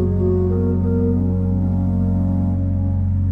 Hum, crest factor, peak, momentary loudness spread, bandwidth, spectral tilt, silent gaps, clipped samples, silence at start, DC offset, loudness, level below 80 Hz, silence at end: none; 10 dB; -8 dBFS; 2 LU; 2 kHz; -13 dB/octave; none; under 0.1%; 0 s; under 0.1%; -19 LUFS; -30 dBFS; 0 s